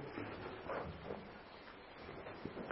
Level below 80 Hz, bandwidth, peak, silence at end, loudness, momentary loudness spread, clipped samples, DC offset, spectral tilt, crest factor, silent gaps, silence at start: -64 dBFS; 5.6 kHz; -26 dBFS; 0 s; -49 LUFS; 9 LU; under 0.1%; under 0.1%; -4.5 dB/octave; 22 dB; none; 0 s